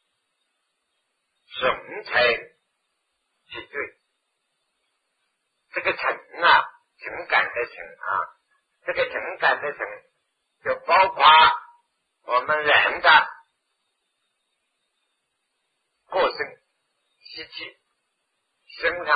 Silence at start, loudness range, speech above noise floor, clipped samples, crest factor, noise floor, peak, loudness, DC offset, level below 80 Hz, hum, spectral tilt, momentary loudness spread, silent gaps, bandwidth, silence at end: 1.5 s; 14 LU; 55 dB; under 0.1%; 24 dB; -76 dBFS; -2 dBFS; -20 LUFS; under 0.1%; -62 dBFS; none; -4.5 dB/octave; 20 LU; none; 5 kHz; 0 s